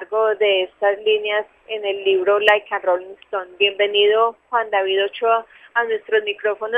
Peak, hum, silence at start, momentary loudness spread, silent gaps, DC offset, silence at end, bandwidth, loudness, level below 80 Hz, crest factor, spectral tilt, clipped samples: 0 dBFS; none; 0 s; 9 LU; none; under 0.1%; 0 s; 3.8 kHz; -19 LUFS; -70 dBFS; 20 dB; -3.5 dB/octave; under 0.1%